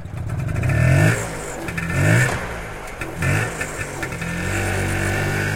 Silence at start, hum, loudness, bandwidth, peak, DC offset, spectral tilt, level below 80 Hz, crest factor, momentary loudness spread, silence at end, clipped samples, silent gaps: 0 s; none; -21 LUFS; 17 kHz; -4 dBFS; under 0.1%; -5.5 dB/octave; -36 dBFS; 18 dB; 12 LU; 0 s; under 0.1%; none